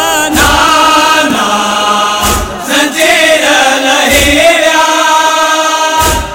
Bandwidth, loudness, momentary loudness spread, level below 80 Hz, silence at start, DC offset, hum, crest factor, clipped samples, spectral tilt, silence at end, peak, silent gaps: 17.5 kHz; -7 LUFS; 4 LU; -26 dBFS; 0 s; under 0.1%; none; 8 dB; 0.3%; -2 dB/octave; 0 s; 0 dBFS; none